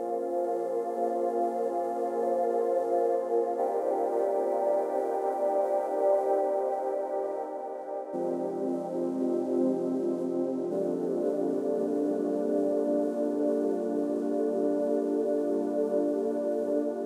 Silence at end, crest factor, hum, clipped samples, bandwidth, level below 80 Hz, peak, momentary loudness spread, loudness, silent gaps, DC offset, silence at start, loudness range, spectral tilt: 0 s; 14 dB; none; under 0.1%; 13.5 kHz; -88 dBFS; -14 dBFS; 4 LU; -29 LUFS; none; under 0.1%; 0 s; 3 LU; -8 dB/octave